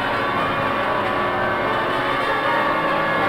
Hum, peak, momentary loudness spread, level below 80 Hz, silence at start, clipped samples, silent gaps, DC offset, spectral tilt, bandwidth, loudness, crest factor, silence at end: none; -8 dBFS; 2 LU; -46 dBFS; 0 s; under 0.1%; none; under 0.1%; -5.5 dB/octave; 17 kHz; -20 LUFS; 14 dB; 0 s